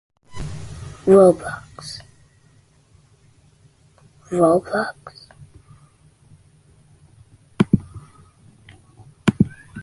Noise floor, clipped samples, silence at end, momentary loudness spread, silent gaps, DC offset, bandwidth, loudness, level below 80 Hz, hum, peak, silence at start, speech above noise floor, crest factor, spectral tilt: -55 dBFS; under 0.1%; 0 s; 24 LU; none; under 0.1%; 11.5 kHz; -19 LUFS; -46 dBFS; none; -2 dBFS; 0.35 s; 39 dB; 22 dB; -7 dB/octave